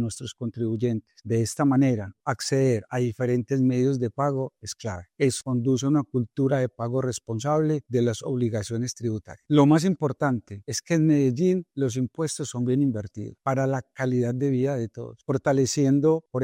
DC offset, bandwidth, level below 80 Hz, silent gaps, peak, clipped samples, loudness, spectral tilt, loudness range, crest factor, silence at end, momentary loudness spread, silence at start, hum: under 0.1%; 15.5 kHz; -64 dBFS; none; -8 dBFS; under 0.1%; -25 LUFS; -6.5 dB/octave; 3 LU; 18 dB; 0 s; 10 LU; 0 s; none